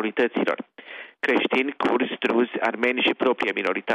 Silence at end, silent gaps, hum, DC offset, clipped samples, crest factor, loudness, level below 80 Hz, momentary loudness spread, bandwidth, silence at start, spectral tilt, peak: 0 s; none; none; under 0.1%; under 0.1%; 16 dB; -23 LUFS; -70 dBFS; 9 LU; 9.6 kHz; 0 s; -5 dB/octave; -8 dBFS